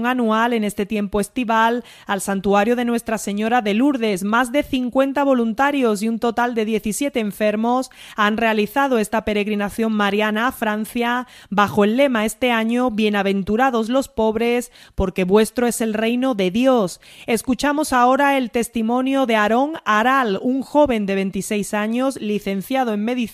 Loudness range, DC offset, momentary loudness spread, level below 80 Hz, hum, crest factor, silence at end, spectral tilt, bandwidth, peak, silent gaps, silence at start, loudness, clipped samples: 2 LU; under 0.1%; 6 LU; -44 dBFS; none; 16 dB; 0 s; -5 dB/octave; 15.5 kHz; -2 dBFS; none; 0 s; -19 LUFS; under 0.1%